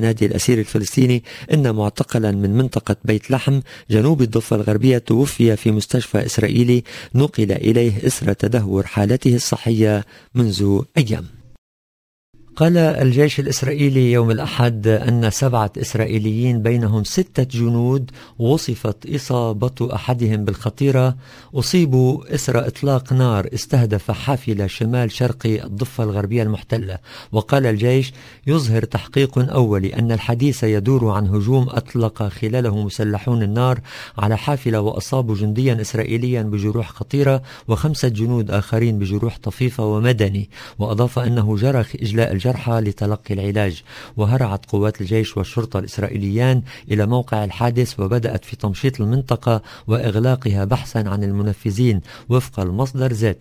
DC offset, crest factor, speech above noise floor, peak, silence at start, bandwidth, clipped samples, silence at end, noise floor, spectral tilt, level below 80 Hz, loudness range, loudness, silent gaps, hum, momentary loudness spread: under 0.1%; 18 dB; over 72 dB; 0 dBFS; 0 s; 16 kHz; under 0.1%; 0.05 s; under -90 dBFS; -6.5 dB/octave; -40 dBFS; 3 LU; -19 LUFS; 11.58-12.33 s; none; 7 LU